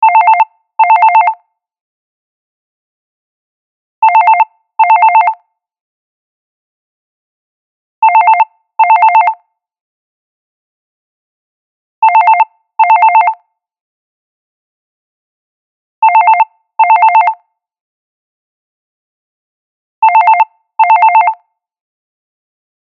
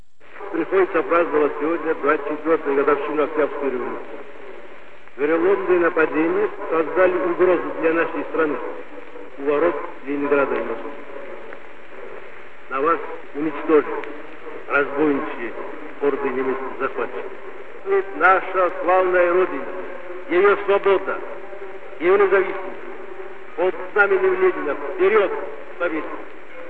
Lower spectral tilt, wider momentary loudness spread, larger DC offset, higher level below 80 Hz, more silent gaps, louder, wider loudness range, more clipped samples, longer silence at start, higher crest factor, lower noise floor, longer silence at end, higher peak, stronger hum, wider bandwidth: second, 2 dB/octave vs -7.5 dB/octave; second, 9 LU vs 19 LU; second, under 0.1% vs 3%; second, under -90 dBFS vs -62 dBFS; first, 1.81-4.02 s, 5.81-8.02 s, 9.81-12.02 s, 13.81-16.02 s, 17.81-20.02 s vs none; first, -8 LUFS vs -20 LUFS; about the same, 4 LU vs 5 LU; neither; about the same, 0 s vs 0 s; second, 12 dB vs 18 dB; second, -32 dBFS vs -44 dBFS; first, 1.55 s vs 0 s; about the same, 0 dBFS vs -2 dBFS; neither; about the same, 4.6 kHz vs 4.4 kHz